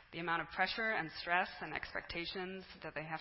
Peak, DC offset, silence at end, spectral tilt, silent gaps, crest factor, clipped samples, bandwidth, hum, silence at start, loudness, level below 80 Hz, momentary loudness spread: -18 dBFS; under 0.1%; 0 s; -7 dB/octave; none; 22 dB; under 0.1%; 5.8 kHz; none; 0 s; -39 LUFS; -64 dBFS; 10 LU